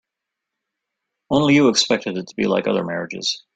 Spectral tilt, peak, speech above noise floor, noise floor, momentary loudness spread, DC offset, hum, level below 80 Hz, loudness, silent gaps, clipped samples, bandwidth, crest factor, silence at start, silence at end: -4 dB/octave; -4 dBFS; 64 dB; -83 dBFS; 9 LU; under 0.1%; none; -58 dBFS; -19 LUFS; none; under 0.1%; 9.2 kHz; 16 dB; 1.3 s; 0.15 s